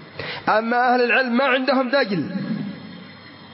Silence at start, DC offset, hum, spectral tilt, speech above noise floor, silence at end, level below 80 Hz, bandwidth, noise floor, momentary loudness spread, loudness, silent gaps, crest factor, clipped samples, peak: 0 s; under 0.1%; none; -9.5 dB/octave; 23 dB; 0 s; -68 dBFS; 5.8 kHz; -42 dBFS; 20 LU; -20 LUFS; none; 16 dB; under 0.1%; -6 dBFS